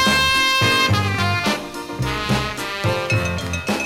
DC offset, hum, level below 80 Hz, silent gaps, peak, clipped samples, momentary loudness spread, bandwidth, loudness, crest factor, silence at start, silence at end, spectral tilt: under 0.1%; none; -38 dBFS; none; -4 dBFS; under 0.1%; 10 LU; 18 kHz; -19 LUFS; 16 dB; 0 s; 0 s; -4 dB/octave